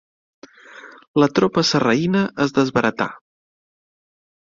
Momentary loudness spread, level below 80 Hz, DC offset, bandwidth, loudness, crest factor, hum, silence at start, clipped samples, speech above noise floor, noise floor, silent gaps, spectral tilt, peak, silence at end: 7 LU; -58 dBFS; under 0.1%; 7.6 kHz; -19 LUFS; 18 dB; none; 0.75 s; under 0.1%; 25 dB; -43 dBFS; 1.08-1.14 s; -5.5 dB/octave; -2 dBFS; 1.35 s